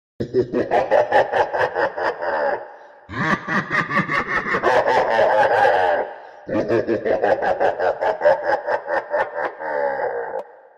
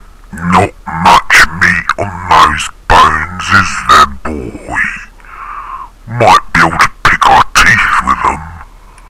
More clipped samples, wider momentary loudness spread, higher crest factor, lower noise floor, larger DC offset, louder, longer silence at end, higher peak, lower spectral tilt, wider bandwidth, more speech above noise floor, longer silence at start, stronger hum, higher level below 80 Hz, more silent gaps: second, under 0.1% vs 2%; second, 9 LU vs 18 LU; first, 18 dB vs 10 dB; first, -40 dBFS vs -33 dBFS; neither; second, -20 LUFS vs -8 LUFS; second, 0.3 s vs 0.45 s; about the same, -2 dBFS vs 0 dBFS; first, -6 dB/octave vs -3 dB/octave; second, 10 kHz vs over 20 kHz; about the same, 22 dB vs 24 dB; about the same, 0.2 s vs 0.25 s; neither; second, -54 dBFS vs -26 dBFS; neither